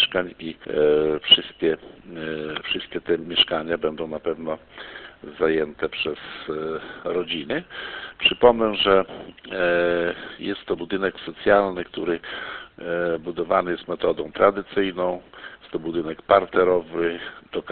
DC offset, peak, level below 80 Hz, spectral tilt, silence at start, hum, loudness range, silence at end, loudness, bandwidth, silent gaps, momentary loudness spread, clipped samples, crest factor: under 0.1%; 0 dBFS; -52 dBFS; -8.5 dB/octave; 0 s; none; 6 LU; 0 s; -23 LUFS; 4.5 kHz; none; 16 LU; under 0.1%; 24 dB